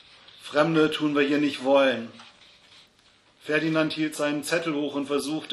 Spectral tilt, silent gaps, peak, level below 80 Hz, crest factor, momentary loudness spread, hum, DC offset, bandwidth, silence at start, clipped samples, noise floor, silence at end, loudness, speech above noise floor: -5 dB/octave; none; -6 dBFS; -72 dBFS; 20 dB; 8 LU; none; under 0.1%; 13 kHz; 0.4 s; under 0.1%; -60 dBFS; 0 s; -25 LUFS; 36 dB